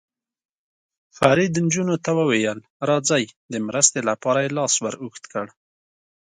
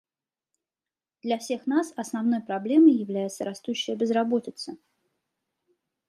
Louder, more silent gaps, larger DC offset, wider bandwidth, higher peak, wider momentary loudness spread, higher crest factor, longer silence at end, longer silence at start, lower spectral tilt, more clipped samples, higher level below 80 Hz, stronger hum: first, -21 LUFS vs -25 LUFS; first, 2.70-2.80 s, 3.37-3.49 s vs none; neither; second, 11.5 kHz vs 13 kHz; first, 0 dBFS vs -8 dBFS; second, 13 LU vs 16 LU; about the same, 22 dB vs 20 dB; second, 0.85 s vs 1.35 s; about the same, 1.2 s vs 1.25 s; second, -3.5 dB/octave vs -5 dB/octave; neither; first, -62 dBFS vs -80 dBFS; neither